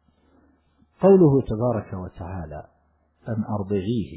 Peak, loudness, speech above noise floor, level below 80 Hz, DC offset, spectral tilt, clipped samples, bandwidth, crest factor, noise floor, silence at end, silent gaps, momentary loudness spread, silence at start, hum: -6 dBFS; -21 LUFS; 41 dB; -46 dBFS; under 0.1%; -13 dB/octave; under 0.1%; 4 kHz; 18 dB; -62 dBFS; 0 s; none; 20 LU; 1 s; none